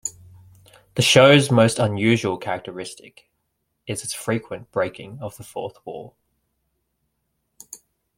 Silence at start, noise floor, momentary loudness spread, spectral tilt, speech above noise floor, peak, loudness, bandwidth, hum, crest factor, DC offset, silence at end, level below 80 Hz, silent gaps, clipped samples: 0.05 s; -74 dBFS; 23 LU; -4.5 dB/octave; 54 dB; -2 dBFS; -19 LUFS; 16.5 kHz; none; 20 dB; under 0.1%; 0.4 s; -58 dBFS; none; under 0.1%